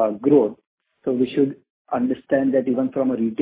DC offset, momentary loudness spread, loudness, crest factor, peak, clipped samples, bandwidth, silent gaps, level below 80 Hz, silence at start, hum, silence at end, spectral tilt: under 0.1%; 9 LU; -21 LUFS; 16 dB; -4 dBFS; under 0.1%; 4 kHz; 0.67-0.78 s, 1.70-1.85 s; -62 dBFS; 0 s; none; 0 s; -11.5 dB/octave